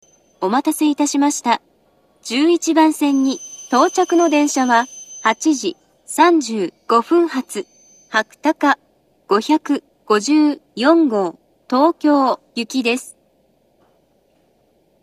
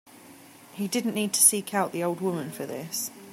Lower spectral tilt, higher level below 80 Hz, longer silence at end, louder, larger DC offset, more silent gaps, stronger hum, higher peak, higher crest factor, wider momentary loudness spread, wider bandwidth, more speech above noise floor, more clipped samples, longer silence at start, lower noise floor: about the same, -3 dB/octave vs -3 dB/octave; about the same, -74 dBFS vs -78 dBFS; first, 1.9 s vs 0 s; first, -17 LUFS vs -25 LUFS; neither; neither; neither; first, 0 dBFS vs -4 dBFS; second, 18 dB vs 24 dB; second, 10 LU vs 16 LU; second, 14.5 kHz vs 16 kHz; first, 43 dB vs 23 dB; neither; first, 0.4 s vs 0.15 s; first, -59 dBFS vs -50 dBFS